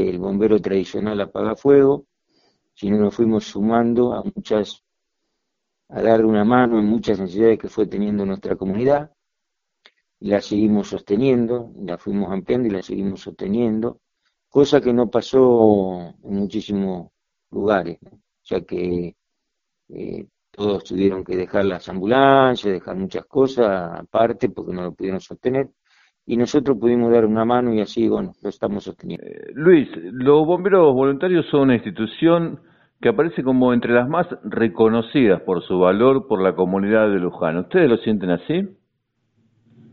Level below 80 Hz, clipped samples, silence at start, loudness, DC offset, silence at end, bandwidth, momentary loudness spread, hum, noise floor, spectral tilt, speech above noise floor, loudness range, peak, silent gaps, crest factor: -52 dBFS; under 0.1%; 0 s; -19 LUFS; under 0.1%; 1.2 s; 7.2 kHz; 13 LU; none; -81 dBFS; -6 dB/octave; 62 dB; 6 LU; 0 dBFS; none; 20 dB